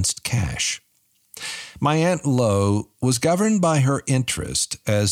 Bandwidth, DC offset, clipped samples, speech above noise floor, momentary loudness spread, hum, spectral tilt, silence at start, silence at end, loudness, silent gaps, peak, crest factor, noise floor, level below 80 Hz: 16 kHz; under 0.1%; under 0.1%; 44 dB; 10 LU; none; -4.5 dB/octave; 0 s; 0 s; -21 LUFS; none; -8 dBFS; 14 dB; -64 dBFS; -46 dBFS